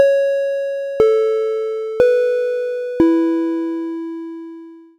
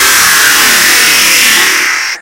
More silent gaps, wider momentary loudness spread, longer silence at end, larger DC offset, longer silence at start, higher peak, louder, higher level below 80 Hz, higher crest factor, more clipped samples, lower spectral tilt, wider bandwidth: neither; first, 14 LU vs 3 LU; first, 0.2 s vs 0 s; neither; about the same, 0 s vs 0 s; about the same, 0 dBFS vs 0 dBFS; second, -18 LUFS vs -4 LUFS; second, -52 dBFS vs -42 dBFS; first, 18 dB vs 6 dB; second, under 0.1% vs 3%; first, -6.5 dB/octave vs 1.5 dB/octave; second, 8.8 kHz vs over 20 kHz